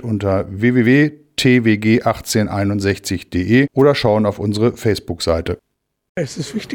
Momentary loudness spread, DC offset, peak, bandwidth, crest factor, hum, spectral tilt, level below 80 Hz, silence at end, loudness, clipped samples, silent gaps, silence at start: 11 LU; under 0.1%; -2 dBFS; 18.5 kHz; 14 dB; none; -6 dB/octave; -42 dBFS; 0 s; -16 LUFS; under 0.1%; 6.09-6.15 s; 0 s